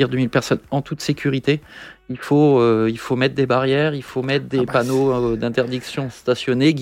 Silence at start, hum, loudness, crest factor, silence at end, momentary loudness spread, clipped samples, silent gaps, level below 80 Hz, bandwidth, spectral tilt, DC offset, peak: 0 s; none; -19 LUFS; 16 dB; 0 s; 9 LU; under 0.1%; none; -50 dBFS; 16 kHz; -6.5 dB/octave; under 0.1%; -2 dBFS